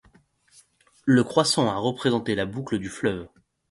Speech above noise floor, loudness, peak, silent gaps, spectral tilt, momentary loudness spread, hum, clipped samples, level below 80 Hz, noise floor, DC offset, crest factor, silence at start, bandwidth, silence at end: 36 dB; -24 LUFS; -4 dBFS; none; -5 dB/octave; 10 LU; none; under 0.1%; -56 dBFS; -59 dBFS; under 0.1%; 20 dB; 1.05 s; 11.5 kHz; 0.45 s